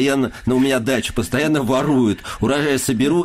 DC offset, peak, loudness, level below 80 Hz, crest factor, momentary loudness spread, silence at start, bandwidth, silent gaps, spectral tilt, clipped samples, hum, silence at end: under 0.1%; -6 dBFS; -18 LUFS; -40 dBFS; 10 dB; 3 LU; 0 s; 15.5 kHz; none; -5 dB/octave; under 0.1%; none; 0 s